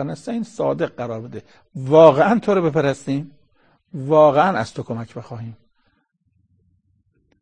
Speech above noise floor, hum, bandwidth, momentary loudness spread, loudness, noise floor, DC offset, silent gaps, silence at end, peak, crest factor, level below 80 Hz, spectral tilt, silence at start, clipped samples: 48 dB; none; 9.6 kHz; 24 LU; -18 LUFS; -66 dBFS; 0.1%; none; 1.85 s; 0 dBFS; 20 dB; -58 dBFS; -7 dB/octave; 0 s; under 0.1%